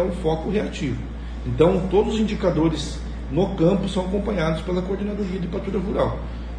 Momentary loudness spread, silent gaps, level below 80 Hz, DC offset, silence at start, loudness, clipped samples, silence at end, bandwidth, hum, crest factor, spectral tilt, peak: 10 LU; none; -32 dBFS; under 0.1%; 0 s; -23 LUFS; under 0.1%; 0 s; 10 kHz; none; 18 dB; -7 dB/octave; -4 dBFS